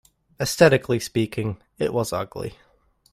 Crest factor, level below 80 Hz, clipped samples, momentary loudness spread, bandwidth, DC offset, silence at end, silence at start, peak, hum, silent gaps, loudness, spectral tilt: 22 dB; -52 dBFS; under 0.1%; 15 LU; 16 kHz; under 0.1%; 0.6 s; 0.4 s; -2 dBFS; none; none; -23 LUFS; -5 dB/octave